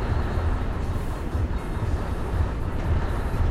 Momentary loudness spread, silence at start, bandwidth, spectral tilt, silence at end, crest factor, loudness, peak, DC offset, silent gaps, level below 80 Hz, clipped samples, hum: 3 LU; 0 s; 13 kHz; -7.5 dB/octave; 0 s; 14 dB; -28 LUFS; -10 dBFS; under 0.1%; none; -28 dBFS; under 0.1%; none